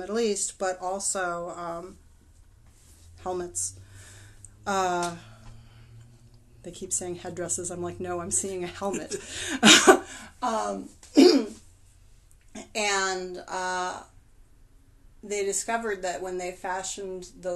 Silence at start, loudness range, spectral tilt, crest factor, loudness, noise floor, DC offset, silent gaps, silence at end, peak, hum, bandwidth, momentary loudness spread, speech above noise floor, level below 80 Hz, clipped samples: 0 s; 13 LU; -2 dB/octave; 26 dB; -26 LUFS; -55 dBFS; under 0.1%; none; 0 s; -2 dBFS; none; 12.5 kHz; 19 LU; 28 dB; -56 dBFS; under 0.1%